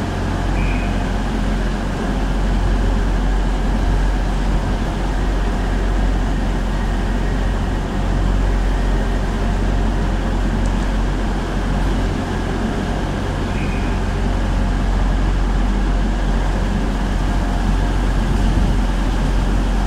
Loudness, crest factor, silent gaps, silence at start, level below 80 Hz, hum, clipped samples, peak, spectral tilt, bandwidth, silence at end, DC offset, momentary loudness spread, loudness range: -20 LUFS; 12 dB; none; 0 s; -18 dBFS; none; under 0.1%; -4 dBFS; -6.5 dB/octave; 10 kHz; 0 s; under 0.1%; 2 LU; 1 LU